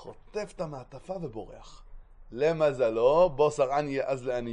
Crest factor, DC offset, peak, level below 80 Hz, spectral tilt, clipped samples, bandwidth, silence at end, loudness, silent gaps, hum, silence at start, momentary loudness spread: 18 dB; under 0.1%; -12 dBFS; -52 dBFS; -6 dB/octave; under 0.1%; 10 kHz; 0 s; -27 LUFS; none; none; 0 s; 18 LU